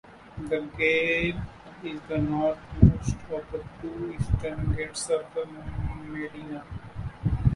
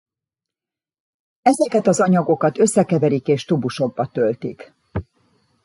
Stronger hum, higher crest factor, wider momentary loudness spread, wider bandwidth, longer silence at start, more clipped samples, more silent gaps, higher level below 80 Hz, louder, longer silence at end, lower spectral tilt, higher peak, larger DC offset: neither; first, 26 dB vs 18 dB; about the same, 17 LU vs 15 LU; about the same, 11.5 kHz vs 11.5 kHz; second, 0.05 s vs 1.45 s; neither; neither; first, -36 dBFS vs -50 dBFS; second, -28 LUFS vs -18 LUFS; second, 0 s vs 0.65 s; about the same, -6.5 dB/octave vs -6 dB/octave; about the same, -2 dBFS vs -2 dBFS; neither